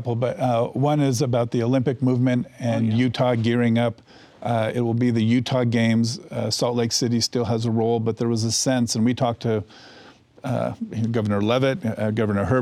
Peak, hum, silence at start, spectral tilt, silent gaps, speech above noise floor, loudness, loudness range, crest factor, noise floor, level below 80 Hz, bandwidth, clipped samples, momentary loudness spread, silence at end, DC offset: -8 dBFS; none; 0 s; -5.5 dB/octave; none; 27 dB; -22 LUFS; 3 LU; 14 dB; -49 dBFS; -60 dBFS; 14 kHz; under 0.1%; 6 LU; 0 s; under 0.1%